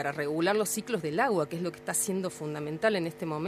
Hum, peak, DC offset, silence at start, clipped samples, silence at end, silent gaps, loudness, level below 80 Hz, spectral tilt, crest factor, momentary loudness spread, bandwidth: none; -12 dBFS; under 0.1%; 0 s; under 0.1%; 0 s; none; -30 LUFS; -70 dBFS; -4 dB/octave; 18 dB; 8 LU; 15.5 kHz